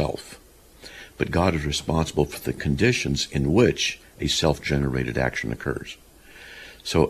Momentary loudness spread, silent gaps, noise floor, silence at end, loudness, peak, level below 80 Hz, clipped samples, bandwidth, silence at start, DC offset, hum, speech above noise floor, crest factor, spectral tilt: 20 LU; none; -47 dBFS; 0 s; -24 LUFS; -4 dBFS; -38 dBFS; under 0.1%; 14.5 kHz; 0 s; under 0.1%; none; 24 dB; 20 dB; -5 dB/octave